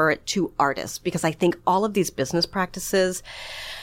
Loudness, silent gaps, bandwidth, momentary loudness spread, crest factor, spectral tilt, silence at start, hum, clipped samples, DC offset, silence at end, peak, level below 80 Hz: -24 LUFS; none; 16.5 kHz; 9 LU; 18 dB; -4 dB/octave; 0 s; none; under 0.1%; under 0.1%; 0 s; -6 dBFS; -52 dBFS